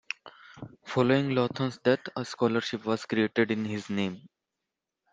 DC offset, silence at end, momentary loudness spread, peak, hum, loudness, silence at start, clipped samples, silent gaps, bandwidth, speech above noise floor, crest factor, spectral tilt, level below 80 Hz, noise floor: under 0.1%; 0.85 s; 14 LU; -10 dBFS; none; -28 LUFS; 0.25 s; under 0.1%; none; 9.4 kHz; 59 dB; 20 dB; -6 dB/octave; -70 dBFS; -86 dBFS